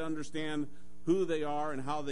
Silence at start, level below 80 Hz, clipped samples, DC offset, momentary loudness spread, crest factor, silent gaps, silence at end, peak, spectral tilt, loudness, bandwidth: 0 s; -64 dBFS; under 0.1%; 2%; 9 LU; 16 dB; none; 0 s; -18 dBFS; -6 dB/octave; -35 LUFS; 10.5 kHz